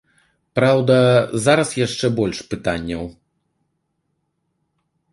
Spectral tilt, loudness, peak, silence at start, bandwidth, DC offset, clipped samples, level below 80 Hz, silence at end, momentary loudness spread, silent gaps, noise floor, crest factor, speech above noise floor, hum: -5.5 dB/octave; -18 LUFS; -2 dBFS; 0.55 s; 11.5 kHz; under 0.1%; under 0.1%; -48 dBFS; 2 s; 13 LU; none; -72 dBFS; 18 dB; 54 dB; none